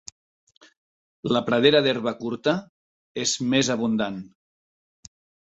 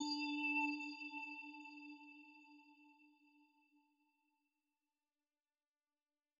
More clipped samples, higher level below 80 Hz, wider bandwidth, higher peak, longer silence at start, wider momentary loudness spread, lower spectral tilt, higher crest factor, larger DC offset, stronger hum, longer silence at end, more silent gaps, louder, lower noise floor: neither; first, -64 dBFS vs under -90 dBFS; first, 8.2 kHz vs 7.2 kHz; first, -4 dBFS vs -30 dBFS; first, 1.25 s vs 0 s; second, 16 LU vs 24 LU; first, -4 dB/octave vs 2.5 dB/octave; about the same, 22 dB vs 20 dB; neither; neither; second, 1.15 s vs 3.3 s; first, 2.69-3.15 s vs none; first, -23 LUFS vs -43 LUFS; about the same, under -90 dBFS vs under -90 dBFS